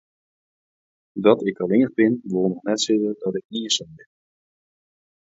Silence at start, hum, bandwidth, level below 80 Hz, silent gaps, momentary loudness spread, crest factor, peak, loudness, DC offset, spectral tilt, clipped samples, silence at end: 1.15 s; none; 8 kHz; -66 dBFS; 3.45-3.49 s; 9 LU; 22 dB; -2 dBFS; -21 LUFS; under 0.1%; -4.5 dB/octave; under 0.1%; 1.35 s